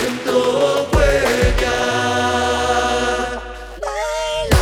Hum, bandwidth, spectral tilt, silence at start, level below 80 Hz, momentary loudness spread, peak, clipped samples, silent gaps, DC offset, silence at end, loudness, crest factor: none; 18 kHz; -4.5 dB/octave; 0 s; -26 dBFS; 9 LU; 0 dBFS; under 0.1%; none; under 0.1%; 0 s; -17 LUFS; 18 dB